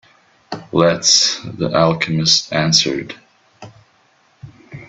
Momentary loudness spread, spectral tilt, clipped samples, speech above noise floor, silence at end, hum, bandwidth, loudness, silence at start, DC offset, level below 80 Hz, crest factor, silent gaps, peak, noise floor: 21 LU; -3 dB/octave; under 0.1%; 40 dB; 0.05 s; none; 8.2 kHz; -14 LUFS; 0.5 s; under 0.1%; -54 dBFS; 18 dB; none; 0 dBFS; -56 dBFS